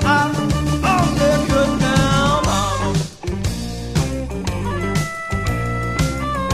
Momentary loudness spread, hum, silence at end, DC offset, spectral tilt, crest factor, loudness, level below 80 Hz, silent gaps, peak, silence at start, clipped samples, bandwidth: 8 LU; none; 0 s; under 0.1%; -5.5 dB/octave; 16 dB; -19 LUFS; -28 dBFS; none; -2 dBFS; 0 s; under 0.1%; 15 kHz